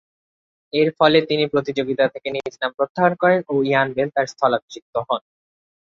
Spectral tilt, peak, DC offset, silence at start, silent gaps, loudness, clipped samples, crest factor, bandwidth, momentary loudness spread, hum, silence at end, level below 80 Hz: -6 dB/octave; -2 dBFS; under 0.1%; 0.75 s; 2.74-2.78 s, 2.89-2.95 s, 4.62-4.68 s, 4.82-4.93 s; -20 LUFS; under 0.1%; 18 dB; 7.6 kHz; 10 LU; none; 0.65 s; -62 dBFS